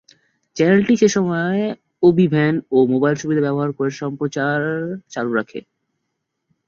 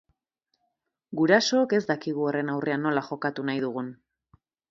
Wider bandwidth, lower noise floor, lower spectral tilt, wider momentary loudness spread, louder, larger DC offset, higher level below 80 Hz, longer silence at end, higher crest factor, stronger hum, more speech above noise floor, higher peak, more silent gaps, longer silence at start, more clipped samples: about the same, 7.6 kHz vs 7.8 kHz; about the same, -76 dBFS vs -79 dBFS; first, -6.5 dB/octave vs -5 dB/octave; about the same, 11 LU vs 11 LU; first, -18 LUFS vs -26 LUFS; neither; first, -58 dBFS vs -72 dBFS; first, 1.05 s vs 0.75 s; second, 16 dB vs 22 dB; neither; first, 58 dB vs 53 dB; first, -2 dBFS vs -6 dBFS; neither; second, 0.55 s vs 1.1 s; neither